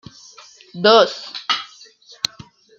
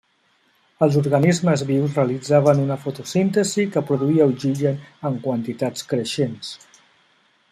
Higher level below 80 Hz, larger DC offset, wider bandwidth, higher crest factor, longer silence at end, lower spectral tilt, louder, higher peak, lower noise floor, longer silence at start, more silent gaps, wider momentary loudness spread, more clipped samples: about the same, -66 dBFS vs -62 dBFS; neither; about the same, 15 kHz vs 14 kHz; about the same, 20 dB vs 18 dB; first, 1.15 s vs 0.95 s; second, -3 dB/octave vs -6.5 dB/octave; about the same, -18 LUFS vs -20 LUFS; about the same, -2 dBFS vs -2 dBFS; second, -46 dBFS vs -63 dBFS; about the same, 0.75 s vs 0.8 s; neither; first, 19 LU vs 9 LU; neither